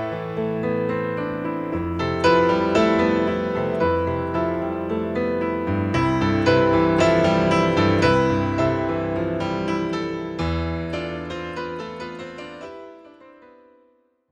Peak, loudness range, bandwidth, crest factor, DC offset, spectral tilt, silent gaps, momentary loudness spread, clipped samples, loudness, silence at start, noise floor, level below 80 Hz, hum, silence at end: -6 dBFS; 11 LU; 9.8 kHz; 16 dB; under 0.1%; -7 dB/octave; none; 13 LU; under 0.1%; -22 LUFS; 0 s; -61 dBFS; -42 dBFS; none; 1 s